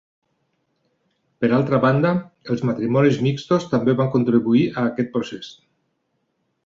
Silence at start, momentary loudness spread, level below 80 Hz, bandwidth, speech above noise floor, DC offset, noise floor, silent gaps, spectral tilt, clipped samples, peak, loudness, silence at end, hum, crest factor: 1.4 s; 9 LU; -58 dBFS; 7.4 kHz; 52 dB; under 0.1%; -71 dBFS; none; -8 dB/octave; under 0.1%; -4 dBFS; -20 LUFS; 1.15 s; none; 18 dB